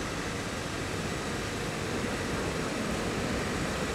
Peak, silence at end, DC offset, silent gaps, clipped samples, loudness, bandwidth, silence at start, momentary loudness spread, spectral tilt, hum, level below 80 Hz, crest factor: -18 dBFS; 0 s; under 0.1%; none; under 0.1%; -32 LUFS; 16 kHz; 0 s; 2 LU; -4.5 dB/octave; none; -46 dBFS; 14 dB